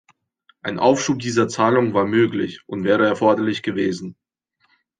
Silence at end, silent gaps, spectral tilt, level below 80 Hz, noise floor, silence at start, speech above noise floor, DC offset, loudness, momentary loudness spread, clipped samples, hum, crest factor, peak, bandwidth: 0.85 s; none; -5.5 dB/octave; -64 dBFS; -68 dBFS; 0.65 s; 49 dB; under 0.1%; -19 LUFS; 11 LU; under 0.1%; none; 18 dB; -2 dBFS; 9.6 kHz